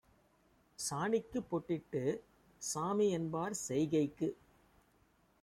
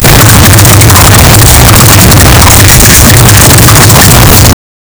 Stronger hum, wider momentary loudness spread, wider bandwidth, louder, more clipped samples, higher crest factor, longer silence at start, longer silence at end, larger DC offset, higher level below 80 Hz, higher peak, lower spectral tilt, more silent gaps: neither; first, 7 LU vs 1 LU; second, 15.5 kHz vs over 20 kHz; second, -37 LUFS vs 0 LUFS; second, under 0.1% vs 90%; first, 16 dB vs 0 dB; first, 0.8 s vs 0 s; first, 1.1 s vs 0.45 s; neither; second, -70 dBFS vs -10 dBFS; second, -22 dBFS vs 0 dBFS; first, -5 dB/octave vs -3.5 dB/octave; neither